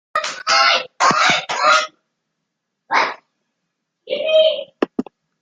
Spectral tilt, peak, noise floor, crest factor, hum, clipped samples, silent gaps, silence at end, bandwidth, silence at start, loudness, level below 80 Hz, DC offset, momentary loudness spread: -1.5 dB/octave; -2 dBFS; -76 dBFS; 18 dB; none; under 0.1%; none; 0.4 s; 9.4 kHz; 0.15 s; -16 LUFS; -68 dBFS; under 0.1%; 11 LU